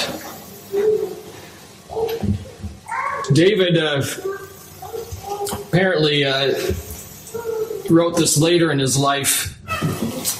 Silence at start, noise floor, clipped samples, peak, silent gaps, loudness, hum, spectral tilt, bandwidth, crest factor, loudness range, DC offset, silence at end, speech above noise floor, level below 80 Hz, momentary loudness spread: 0 s; -41 dBFS; under 0.1%; -2 dBFS; none; -19 LUFS; none; -4 dB/octave; 16 kHz; 18 dB; 3 LU; under 0.1%; 0 s; 24 dB; -46 dBFS; 18 LU